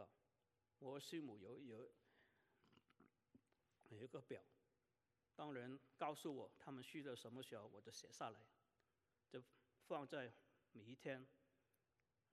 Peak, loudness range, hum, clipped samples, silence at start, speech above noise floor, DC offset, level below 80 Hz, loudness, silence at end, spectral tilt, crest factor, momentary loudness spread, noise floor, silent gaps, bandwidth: -34 dBFS; 8 LU; none; under 0.1%; 0 s; over 35 dB; under 0.1%; under -90 dBFS; -56 LUFS; 0.95 s; -5 dB/octave; 24 dB; 11 LU; under -90 dBFS; none; 13 kHz